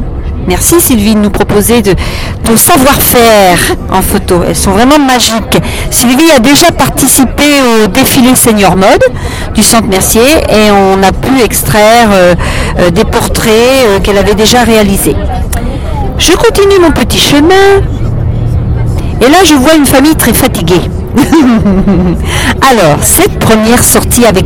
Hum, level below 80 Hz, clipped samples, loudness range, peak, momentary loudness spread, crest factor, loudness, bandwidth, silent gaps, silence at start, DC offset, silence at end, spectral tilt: none; -18 dBFS; 4%; 2 LU; 0 dBFS; 8 LU; 6 dB; -5 LUFS; over 20 kHz; none; 0 s; under 0.1%; 0 s; -4 dB/octave